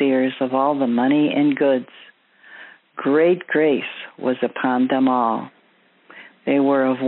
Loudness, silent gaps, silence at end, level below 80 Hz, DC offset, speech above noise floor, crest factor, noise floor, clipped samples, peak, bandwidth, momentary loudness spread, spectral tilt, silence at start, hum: -19 LUFS; none; 0 s; -76 dBFS; under 0.1%; 39 dB; 14 dB; -57 dBFS; under 0.1%; -6 dBFS; 4.1 kHz; 10 LU; -4.5 dB/octave; 0 s; none